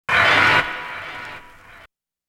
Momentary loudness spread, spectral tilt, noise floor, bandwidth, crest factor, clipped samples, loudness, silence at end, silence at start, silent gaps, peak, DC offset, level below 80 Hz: 22 LU; -3 dB/octave; -52 dBFS; 16.5 kHz; 18 dB; under 0.1%; -16 LUFS; 0.5 s; 0.1 s; none; -2 dBFS; under 0.1%; -52 dBFS